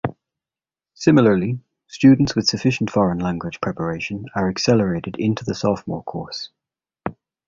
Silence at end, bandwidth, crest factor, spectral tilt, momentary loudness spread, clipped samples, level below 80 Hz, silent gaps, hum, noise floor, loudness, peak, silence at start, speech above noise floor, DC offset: 0.35 s; 7.6 kHz; 18 dB; -6 dB/octave; 17 LU; under 0.1%; -48 dBFS; none; none; under -90 dBFS; -20 LUFS; -2 dBFS; 0.05 s; over 71 dB; under 0.1%